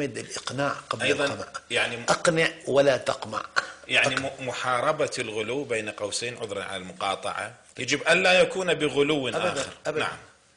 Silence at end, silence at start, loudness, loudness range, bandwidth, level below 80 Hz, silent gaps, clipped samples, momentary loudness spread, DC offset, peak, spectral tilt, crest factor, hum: 0.3 s; 0 s; -25 LUFS; 4 LU; 10.5 kHz; -62 dBFS; none; under 0.1%; 11 LU; under 0.1%; -10 dBFS; -3 dB/octave; 18 dB; none